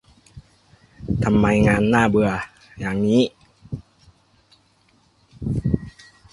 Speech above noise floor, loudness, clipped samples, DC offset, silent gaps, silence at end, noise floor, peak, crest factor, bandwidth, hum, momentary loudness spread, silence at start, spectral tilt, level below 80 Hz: 42 dB; -20 LUFS; under 0.1%; under 0.1%; none; 0.45 s; -60 dBFS; -2 dBFS; 20 dB; 11.5 kHz; none; 20 LU; 0.35 s; -7 dB/octave; -40 dBFS